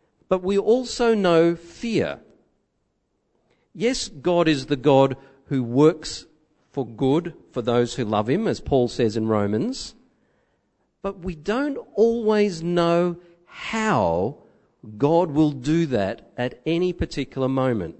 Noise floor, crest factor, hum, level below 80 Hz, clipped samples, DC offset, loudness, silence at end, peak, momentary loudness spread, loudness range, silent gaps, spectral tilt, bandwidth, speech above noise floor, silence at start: -72 dBFS; 20 dB; none; -48 dBFS; under 0.1%; under 0.1%; -22 LUFS; 0.05 s; -4 dBFS; 13 LU; 4 LU; none; -6 dB/octave; 8.6 kHz; 50 dB; 0.3 s